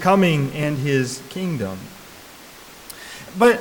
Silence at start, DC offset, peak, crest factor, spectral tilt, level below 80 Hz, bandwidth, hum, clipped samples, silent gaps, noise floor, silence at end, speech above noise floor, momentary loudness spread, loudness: 0 s; under 0.1%; -6 dBFS; 16 dB; -6 dB/octave; -54 dBFS; 19 kHz; none; under 0.1%; none; -42 dBFS; 0 s; 22 dB; 24 LU; -21 LUFS